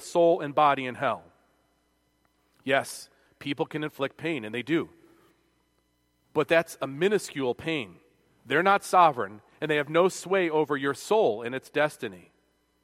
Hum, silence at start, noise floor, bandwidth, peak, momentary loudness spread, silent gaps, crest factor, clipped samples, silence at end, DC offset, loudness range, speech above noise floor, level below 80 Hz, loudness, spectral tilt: none; 0 s; -71 dBFS; 16 kHz; -6 dBFS; 14 LU; none; 22 dB; under 0.1%; 0.65 s; under 0.1%; 8 LU; 45 dB; -72 dBFS; -26 LUFS; -4.5 dB/octave